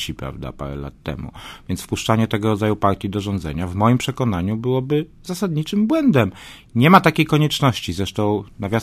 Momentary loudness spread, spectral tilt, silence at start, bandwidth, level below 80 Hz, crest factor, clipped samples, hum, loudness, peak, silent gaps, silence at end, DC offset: 14 LU; -6 dB/octave; 0 s; 15.5 kHz; -40 dBFS; 20 dB; under 0.1%; none; -19 LUFS; 0 dBFS; none; 0 s; under 0.1%